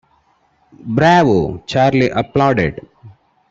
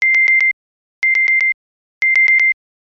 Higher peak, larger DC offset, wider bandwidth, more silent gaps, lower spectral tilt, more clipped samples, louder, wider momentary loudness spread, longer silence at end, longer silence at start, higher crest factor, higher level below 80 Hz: first, 0 dBFS vs -6 dBFS; neither; first, 8 kHz vs 7.2 kHz; second, none vs 0.53-1.02 s, 1.54-2.01 s; first, -7 dB/octave vs 5 dB/octave; neither; about the same, -14 LUFS vs -12 LUFS; about the same, 11 LU vs 12 LU; about the same, 0.4 s vs 0.4 s; first, 0.85 s vs 0 s; first, 16 dB vs 10 dB; first, -44 dBFS vs under -90 dBFS